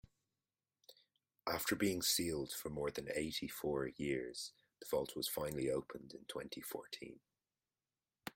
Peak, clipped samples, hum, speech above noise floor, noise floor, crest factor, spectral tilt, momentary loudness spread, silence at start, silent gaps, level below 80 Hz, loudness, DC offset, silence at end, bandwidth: -22 dBFS; under 0.1%; none; over 49 dB; under -90 dBFS; 20 dB; -3.5 dB/octave; 15 LU; 0.9 s; none; -68 dBFS; -41 LUFS; under 0.1%; 0.05 s; 16.5 kHz